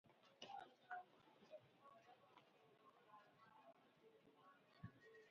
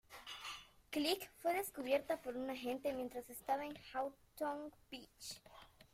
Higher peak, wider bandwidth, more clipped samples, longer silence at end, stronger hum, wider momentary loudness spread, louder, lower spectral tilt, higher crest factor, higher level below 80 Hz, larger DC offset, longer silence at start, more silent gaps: second, -40 dBFS vs -24 dBFS; second, 6.8 kHz vs 16 kHz; neither; about the same, 0 s vs 0.1 s; neither; about the same, 12 LU vs 14 LU; second, -63 LUFS vs -43 LUFS; about the same, -3 dB/octave vs -3 dB/octave; about the same, 24 dB vs 20 dB; second, -90 dBFS vs -74 dBFS; neither; about the same, 0.05 s vs 0.1 s; neither